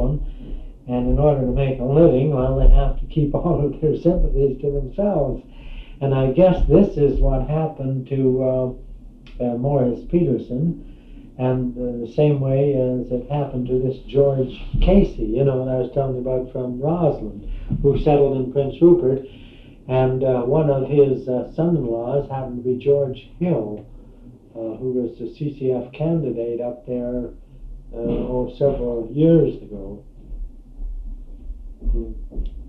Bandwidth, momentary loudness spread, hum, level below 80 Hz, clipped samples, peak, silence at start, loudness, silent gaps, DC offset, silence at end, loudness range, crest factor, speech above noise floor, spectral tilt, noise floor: 4.3 kHz; 19 LU; none; -28 dBFS; under 0.1%; -2 dBFS; 0 s; -20 LUFS; none; under 0.1%; 0 s; 6 LU; 18 dB; 25 dB; -11 dB/octave; -43 dBFS